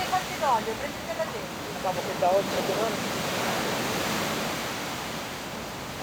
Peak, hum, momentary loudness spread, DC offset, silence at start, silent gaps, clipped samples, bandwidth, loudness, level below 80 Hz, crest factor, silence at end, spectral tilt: -14 dBFS; none; 9 LU; under 0.1%; 0 s; none; under 0.1%; over 20 kHz; -28 LUFS; -54 dBFS; 16 dB; 0 s; -3.5 dB/octave